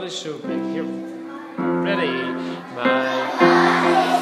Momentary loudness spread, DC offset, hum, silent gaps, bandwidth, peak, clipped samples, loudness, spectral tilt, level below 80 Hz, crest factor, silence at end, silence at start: 15 LU; under 0.1%; none; none; 13 kHz; -2 dBFS; under 0.1%; -20 LUFS; -5 dB/octave; -68 dBFS; 18 dB; 0 s; 0 s